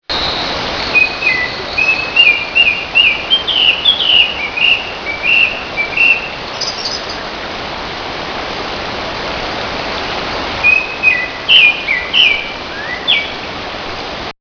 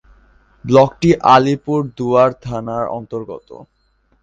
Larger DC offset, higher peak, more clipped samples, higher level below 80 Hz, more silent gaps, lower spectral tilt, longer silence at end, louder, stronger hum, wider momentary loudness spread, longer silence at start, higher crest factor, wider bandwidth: neither; about the same, 0 dBFS vs 0 dBFS; neither; first, -38 dBFS vs -46 dBFS; neither; second, -2 dB/octave vs -7 dB/octave; second, 0.1 s vs 0.6 s; first, -12 LUFS vs -15 LUFS; neither; second, 14 LU vs 17 LU; second, 0.1 s vs 0.65 s; about the same, 14 dB vs 16 dB; second, 5.4 kHz vs 7.8 kHz